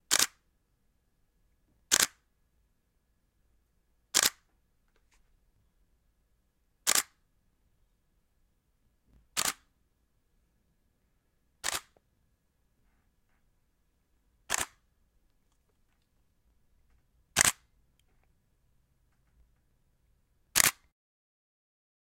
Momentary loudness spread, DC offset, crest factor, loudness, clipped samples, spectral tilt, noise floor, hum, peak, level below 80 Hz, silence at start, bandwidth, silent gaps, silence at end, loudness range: 13 LU; under 0.1%; 38 dB; -28 LUFS; under 0.1%; 1 dB/octave; -74 dBFS; none; 0 dBFS; -66 dBFS; 0.1 s; 16.5 kHz; none; 1.35 s; 11 LU